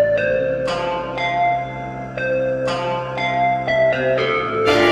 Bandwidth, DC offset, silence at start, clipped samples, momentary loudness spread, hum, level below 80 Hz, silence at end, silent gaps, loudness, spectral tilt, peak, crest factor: 14 kHz; under 0.1%; 0 s; under 0.1%; 6 LU; none; -46 dBFS; 0 s; none; -19 LUFS; -5.5 dB/octave; -2 dBFS; 16 dB